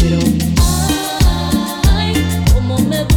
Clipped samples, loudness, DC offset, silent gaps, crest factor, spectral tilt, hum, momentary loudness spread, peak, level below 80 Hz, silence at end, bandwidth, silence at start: under 0.1%; -14 LUFS; under 0.1%; none; 10 dB; -5 dB/octave; none; 2 LU; -2 dBFS; -18 dBFS; 0 s; 19 kHz; 0 s